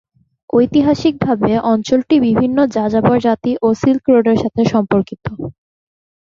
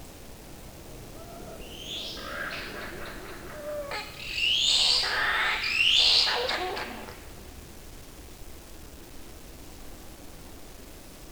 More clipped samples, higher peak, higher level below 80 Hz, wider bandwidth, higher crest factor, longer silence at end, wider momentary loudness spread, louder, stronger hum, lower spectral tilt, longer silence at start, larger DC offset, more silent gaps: neither; first, -2 dBFS vs -8 dBFS; about the same, -46 dBFS vs -48 dBFS; second, 7.4 kHz vs over 20 kHz; second, 14 dB vs 22 dB; first, 0.7 s vs 0 s; second, 5 LU vs 26 LU; first, -14 LUFS vs -24 LUFS; neither; first, -7.5 dB/octave vs -1 dB/octave; first, 0.55 s vs 0 s; neither; neither